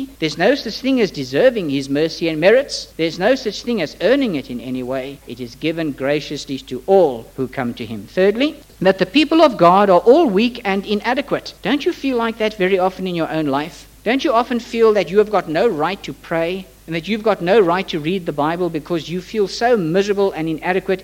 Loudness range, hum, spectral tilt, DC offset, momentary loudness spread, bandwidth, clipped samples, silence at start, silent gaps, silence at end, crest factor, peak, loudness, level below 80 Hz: 6 LU; none; -5.5 dB/octave; under 0.1%; 12 LU; 17 kHz; under 0.1%; 0 s; none; 0 s; 18 dB; 0 dBFS; -17 LUFS; -48 dBFS